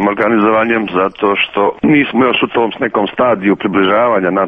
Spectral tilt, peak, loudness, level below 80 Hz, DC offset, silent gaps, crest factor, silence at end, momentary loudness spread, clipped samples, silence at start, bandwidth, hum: -8 dB/octave; 0 dBFS; -12 LUFS; -50 dBFS; under 0.1%; none; 12 dB; 0 s; 4 LU; under 0.1%; 0 s; 4.7 kHz; none